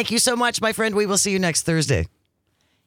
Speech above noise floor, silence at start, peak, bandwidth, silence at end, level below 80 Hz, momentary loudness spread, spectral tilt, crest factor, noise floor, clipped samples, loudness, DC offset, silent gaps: 48 dB; 0 s; -6 dBFS; 19 kHz; 0.8 s; -48 dBFS; 4 LU; -3 dB/octave; 16 dB; -68 dBFS; under 0.1%; -20 LUFS; under 0.1%; none